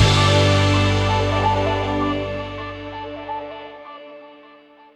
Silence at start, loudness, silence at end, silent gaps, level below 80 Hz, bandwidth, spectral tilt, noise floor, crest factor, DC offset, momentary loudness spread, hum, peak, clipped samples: 0 s; -19 LUFS; 0.6 s; none; -36 dBFS; 10.5 kHz; -5.5 dB/octave; -47 dBFS; 16 dB; under 0.1%; 22 LU; none; -4 dBFS; under 0.1%